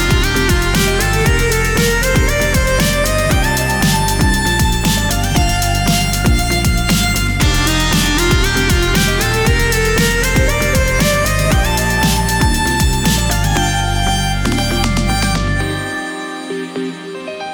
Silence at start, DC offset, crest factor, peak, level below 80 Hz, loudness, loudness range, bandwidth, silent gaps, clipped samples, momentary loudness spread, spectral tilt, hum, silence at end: 0 s; 0.4%; 12 dB; -2 dBFS; -20 dBFS; -14 LUFS; 2 LU; over 20 kHz; none; under 0.1%; 4 LU; -4 dB/octave; none; 0 s